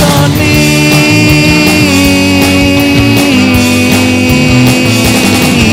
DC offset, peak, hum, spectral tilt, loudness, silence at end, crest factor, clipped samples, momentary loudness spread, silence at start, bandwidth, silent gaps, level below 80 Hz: 0.9%; 0 dBFS; none; -4.5 dB/octave; -6 LUFS; 0 s; 6 dB; 2%; 2 LU; 0 s; 16.5 kHz; none; -24 dBFS